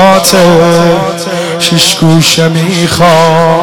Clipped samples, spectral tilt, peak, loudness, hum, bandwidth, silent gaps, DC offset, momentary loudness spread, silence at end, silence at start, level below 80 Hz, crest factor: 0.3%; -4.5 dB/octave; 0 dBFS; -6 LUFS; none; 19 kHz; none; 3%; 6 LU; 0 s; 0 s; -40 dBFS; 6 dB